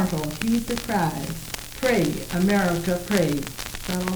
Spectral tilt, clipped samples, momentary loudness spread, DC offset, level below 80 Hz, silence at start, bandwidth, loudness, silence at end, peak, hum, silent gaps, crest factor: -5 dB/octave; under 0.1%; 10 LU; under 0.1%; -42 dBFS; 0 s; over 20 kHz; -24 LUFS; 0 s; -4 dBFS; none; none; 20 dB